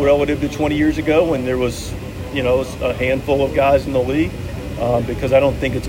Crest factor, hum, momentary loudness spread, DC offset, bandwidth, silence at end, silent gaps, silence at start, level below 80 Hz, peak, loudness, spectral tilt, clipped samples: 14 dB; none; 9 LU; under 0.1%; 16.5 kHz; 0 s; none; 0 s; -32 dBFS; -2 dBFS; -18 LUFS; -6.5 dB/octave; under 0.1%